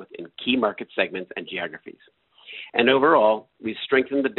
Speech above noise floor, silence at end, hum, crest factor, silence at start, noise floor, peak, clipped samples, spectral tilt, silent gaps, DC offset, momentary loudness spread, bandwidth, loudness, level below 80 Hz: 22 dB; 0.05 s; none; 20 dB; 0 s; -45 dBFS; -4 dBFS; under 0.1%; -1.5 dB/octave; none; under 0.1%; 19 LU; 4.2 kHz; -22 LUFS; -66 dBFS